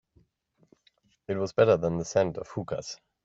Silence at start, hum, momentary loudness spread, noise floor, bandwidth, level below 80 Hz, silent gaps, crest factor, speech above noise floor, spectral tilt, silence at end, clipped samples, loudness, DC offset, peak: 1.3 s; none; 14 LU; -69 dBFS; 7.8 kHz; -60 dBFS; none; 20 dB; 42 dB; -6 dB/octave; 0.3 s; under 0.1%; -28 LUFS; under 0.1%; -8 dBFS